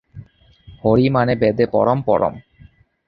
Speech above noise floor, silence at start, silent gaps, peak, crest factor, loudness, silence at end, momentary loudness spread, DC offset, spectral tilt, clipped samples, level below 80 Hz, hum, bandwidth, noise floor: 33 dB; 0.15 s; none; -2 dBFS; 18 dB; -17 LUFS; 0.65 s; 5 LU; under 0.1%; -10.5 dB/octave; under 0.1%; -46 dBFS; none; 5.6 kHz; -49 dBFS